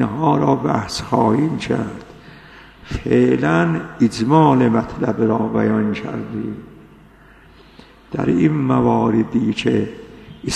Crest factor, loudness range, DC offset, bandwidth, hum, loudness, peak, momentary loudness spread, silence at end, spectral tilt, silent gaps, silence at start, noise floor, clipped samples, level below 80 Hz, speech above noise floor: 18 dB; 6 LU; under 0.1%; 11.5 kHz; none; -18 LUFS; 0 dBFS; 14 LU; 0 s; -7 dB/octave; none; 0 s; -46 dBFS; under 0.1%; -44 dBFS; 29 dB